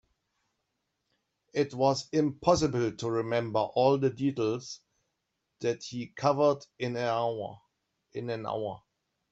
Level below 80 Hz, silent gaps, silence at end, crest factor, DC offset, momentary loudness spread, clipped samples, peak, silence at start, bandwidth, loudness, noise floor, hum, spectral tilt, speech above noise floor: -64 dBFS; none; 0.55 s; 22 dB; under 0.1%; 13 LU; under 0.1%; -8 dBFS; 1.55 s; 8.2 kHz; -30 LUFS; -82 dBFS; none; -6 dB/octave; 53 dB